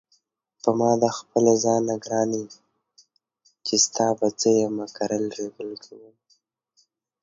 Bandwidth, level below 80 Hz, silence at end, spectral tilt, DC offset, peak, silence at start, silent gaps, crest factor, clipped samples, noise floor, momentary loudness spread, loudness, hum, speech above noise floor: 7.8 kHz; -68 dBFS; 1.25 s; -4 dB/octave; under 0.1%; -4 dBFS; 0.65 s; none; 20 dB; under 0.1%; -68 dBFS; 14 LU; -23 LUFS; none; 45 dB